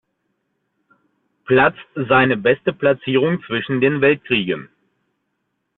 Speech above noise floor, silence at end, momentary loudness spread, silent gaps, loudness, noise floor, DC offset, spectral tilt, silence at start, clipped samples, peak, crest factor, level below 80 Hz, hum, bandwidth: 56 dB; 1.15 s; 7 LU; none; -17 LUFS; -73 dBFS; under 0.1%; -9.5 dB/octave; 1.5 s; under 0.1%; -2 dBFS; 18 dB; -54 dBFS; none; 4.1 kHz